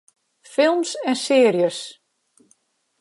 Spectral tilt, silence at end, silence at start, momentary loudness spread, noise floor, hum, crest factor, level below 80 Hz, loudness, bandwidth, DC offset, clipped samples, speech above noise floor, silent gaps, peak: -4 dB/octave; 1.1 s; 0.5 s; 13 LU; -63 dBFS; none; 16 dB; -82 dBFS; -19 LUFS; 11.5 kHz; under 0.1%; under 0.1%; 45 dB; none; -6 dBFS